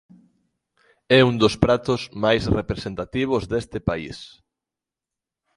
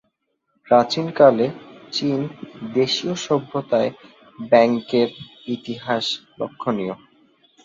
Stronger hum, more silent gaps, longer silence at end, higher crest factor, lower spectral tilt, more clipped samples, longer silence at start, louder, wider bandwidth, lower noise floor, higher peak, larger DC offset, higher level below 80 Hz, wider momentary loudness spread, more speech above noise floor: neither; neither; first, 1.3 s vs 0.7 s; about the same, 22 dB vs 20 dB; about the same, -6 dB/octave vs -5.5 dB/octave; neither; first, 1.1 s vs 0.7 s; about the same, -21 LUFS vs -21 LUFS; first, 11.5 kHz vs 7.8 kHz; first, -88 dBFS vs -71 dBFS; about the same, 0 dBFS vs -2 dBFS; neither; first, -42 dBFS vs -64 dBFS; second, 12 LU vs 16 LU; first, 67 dB vs 51 dB